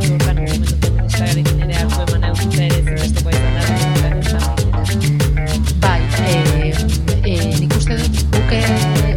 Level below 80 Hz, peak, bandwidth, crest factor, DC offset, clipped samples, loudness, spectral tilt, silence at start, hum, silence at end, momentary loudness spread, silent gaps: -20 dBFS; -2 dBFS; 18 kHz; 14 dB; under 0.1%; under 0.1%; -16 LUFS; -5.5 dB/octave; 0 s; none; 0 s; 3 LU; none